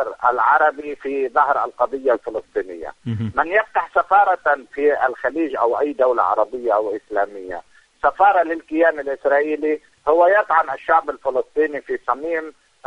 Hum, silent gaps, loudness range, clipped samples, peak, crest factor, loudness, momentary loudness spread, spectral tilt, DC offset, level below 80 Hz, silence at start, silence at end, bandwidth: none; none; 3 LU; under 0.1%; -2 dBFS; 16 dB; -19 LUFS; 11 LU; -7.5 dB/octave; under 0.1%; -56 dBFS; 0 s; 0.35 s; 10 kHz